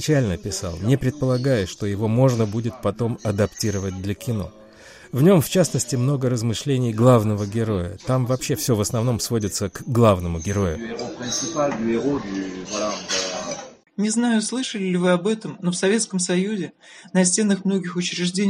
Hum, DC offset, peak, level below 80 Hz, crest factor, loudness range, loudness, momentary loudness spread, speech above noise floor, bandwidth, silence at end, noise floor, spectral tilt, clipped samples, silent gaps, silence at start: none; under 0.1%; -4 dBFS; -48 dBFS; 18 dB; 4 LU; -22 LUFS; 10 LU; 24 dB; 16 kHz; 0 s; -45 dBFS; -5.5 dB/octave; under 0.1%; none; 0 s